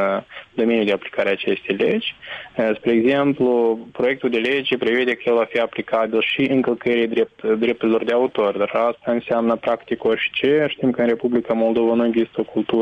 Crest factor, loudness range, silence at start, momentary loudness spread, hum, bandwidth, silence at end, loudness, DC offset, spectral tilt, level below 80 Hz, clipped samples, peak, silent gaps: 12 dB; 1 LU; 0 s; 5 LU; none; 7.2 kHz; 0 s; -20 LUFS; under 0.1%; -7 dB/octave; -60 dBFS; under 0.1%; -8 dBFS; none